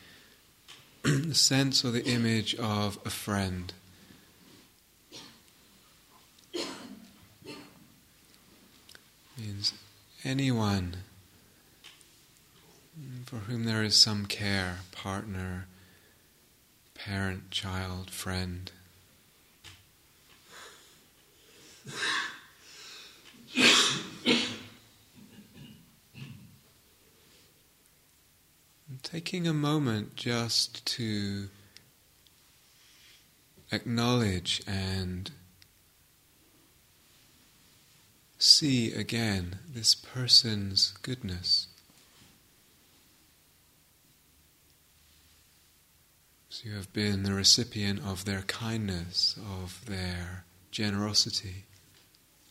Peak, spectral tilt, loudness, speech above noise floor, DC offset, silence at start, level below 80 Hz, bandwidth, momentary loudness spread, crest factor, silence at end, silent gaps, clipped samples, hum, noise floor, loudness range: -6 dBFS; -3 dB/octave; -28 LUFS; 34 dB; under 0.1%; 0.05 s; -62 dBFS; 16 kHz; 26 LU; 28 dB; 0.9 s; none; under 0.1%; none; -64 dBFS; 17 LU